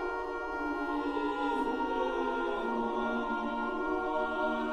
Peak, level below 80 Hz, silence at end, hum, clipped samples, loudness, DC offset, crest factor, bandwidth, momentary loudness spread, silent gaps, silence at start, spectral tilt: -20 dBFS; -54 dBFS; 0 s; none; under 0.1%; -33 LUFS; 0.2%; 12 dB; 11 kHz; 3 LU; none; 0 s; -5.5 dB/octave